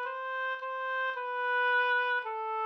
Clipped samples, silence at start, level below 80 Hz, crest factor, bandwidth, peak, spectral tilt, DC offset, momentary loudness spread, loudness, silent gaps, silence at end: under 0.1%; 0 s; -86 dBFS; 12 dB; 6.2 kHz; -20 dBFS; 0.5 dB/octave; under 0.1%; 8 LU; -31 LUFS; none; 0 s